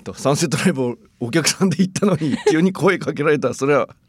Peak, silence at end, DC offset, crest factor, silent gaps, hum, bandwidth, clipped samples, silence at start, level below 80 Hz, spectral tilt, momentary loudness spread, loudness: 0 dBFS; 0.15 s; under 0.1%; 18 dB; none; none; 15.5 kHz; under 0.1%; 0.05 s; -58 dBFS; -5 dB/octave; 5 LU; -18 LUFS